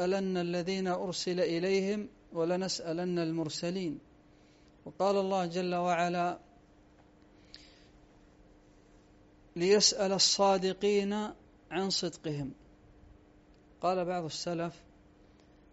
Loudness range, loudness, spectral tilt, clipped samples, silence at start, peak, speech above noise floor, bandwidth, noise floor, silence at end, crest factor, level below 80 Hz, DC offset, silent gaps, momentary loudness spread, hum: 9 LU; -31 LUFS; -3.5 dB/octave; under 0.1%; 0 s; -12 dBFS; 30 dB; 8 kHz; -61 dBFS; 0.95 s; 22 dB; -66 dBFS; under 0.1%; none; 14 LU; none